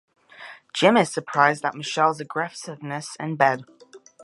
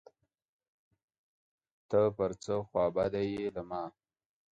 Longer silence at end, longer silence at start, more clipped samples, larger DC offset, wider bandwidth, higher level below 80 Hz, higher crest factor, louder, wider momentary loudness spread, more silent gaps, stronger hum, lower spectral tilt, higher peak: second, 0.25 s vs 0.6 s; second, 0.4 s vs 1.9 s; neither; neither; first, 11.5 kHz vs 9 kHz; second, -76 dBFS vs -64 dBFS; about the same, 22 dB vs 20 dB; first, -23 LUFS vs -33 LUFS; first, 16 LU vs 11 LU; neither; neither; second, -4.5 dB/octave vs -7 dB/octave; first, -2 dBFS vs -16 dBFS